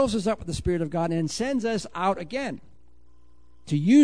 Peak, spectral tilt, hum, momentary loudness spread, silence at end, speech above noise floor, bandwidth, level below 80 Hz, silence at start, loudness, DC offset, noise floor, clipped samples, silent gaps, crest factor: -8 dBFS; -6 dB/octave; 60 Hz at -50 dBFS; 6 LU; 0 s; 35 dB; 10.5 kHz; -46 dBFS; 0 s; -27 LUFS; 0.5%; -59 dBFS; under 0.1%; none; 16 dB